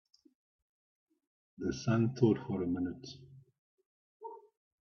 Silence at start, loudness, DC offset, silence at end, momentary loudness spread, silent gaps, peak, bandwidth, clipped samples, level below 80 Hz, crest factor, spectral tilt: 1.6 s; -33 LUFS; under 0.1%; 0.4 s; 21 LU; 3.59-3.78 s, 3.86-4.20 s; -14 dBFS; 7 kHz; under 0.1%; -68 dBFS; 24 dB; -7.5 dB/octave